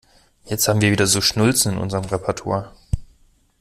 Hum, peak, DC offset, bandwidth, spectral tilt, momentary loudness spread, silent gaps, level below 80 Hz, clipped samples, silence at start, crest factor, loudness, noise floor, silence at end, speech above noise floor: none; -2 dBFS; under 0.1%; 16 kHz; -4 dB/octave; 13 LU; none; -38 dBFS; under 0.1%; 0.45 s; 18 dB; -19 LUFS; -56 dBFS; 0.55 s; 37 dB